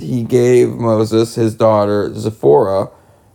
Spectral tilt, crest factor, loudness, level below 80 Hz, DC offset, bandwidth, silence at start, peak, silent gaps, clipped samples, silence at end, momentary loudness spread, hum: -7 dB/octave; 14 dB; -14 LUFS; -52 dBFS; under 0.1%; 17 kHz; 0 s; 0 dBFS; none; under 0.1%; 0.45 s; 7 LU; none